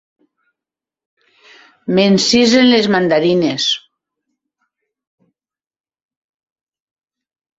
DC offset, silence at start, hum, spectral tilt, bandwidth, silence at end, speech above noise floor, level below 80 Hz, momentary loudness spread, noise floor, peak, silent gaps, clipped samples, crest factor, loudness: under 0.1%; 1.85 s; none; -4.5 dB/octave; 8 kHz; 3.8 s; 75 dB; -58 dBFS; 8 LU; -87 dBFS; -2 dBFS; none; under 0.1%; 16 dB; -13 LUFS